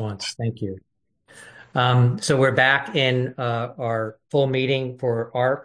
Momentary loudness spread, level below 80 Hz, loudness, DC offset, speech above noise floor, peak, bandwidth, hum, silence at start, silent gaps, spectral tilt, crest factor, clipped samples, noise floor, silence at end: 10 LU; -62 dBFS; -22 LUFS; under 0.1%; 31 dB; -4 dBFS; 10.5 kHz; none; 0 s; none; -5.5 dB/octave; 18 dB; under 0.1%; -52 dBFS; 0 s